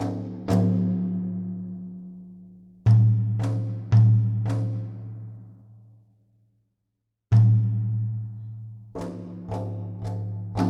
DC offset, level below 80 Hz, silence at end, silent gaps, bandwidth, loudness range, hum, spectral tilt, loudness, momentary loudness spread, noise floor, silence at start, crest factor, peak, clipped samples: under 0.1%; -54 dBFS; 0 s; none; 6 kHz; 4 LU; none; -9.5 dB/octave; -24 LUFS; 20 LU; -79 dBFS; 0 s; 16 dB; -8 dBFS; under 0.1%